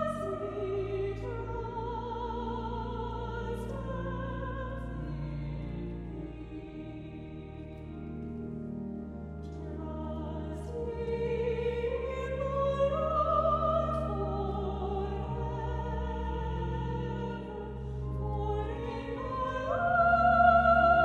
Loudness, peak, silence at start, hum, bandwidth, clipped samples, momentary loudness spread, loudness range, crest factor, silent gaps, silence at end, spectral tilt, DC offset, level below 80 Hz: -32 LUFS; -10 dBFS; 0 s; none; 10 kHz; under 0.1%; 14 LU; 11 LU; 22 dB; none; 0 s; -8 dB/octave; under 0.1%; -42 dBFS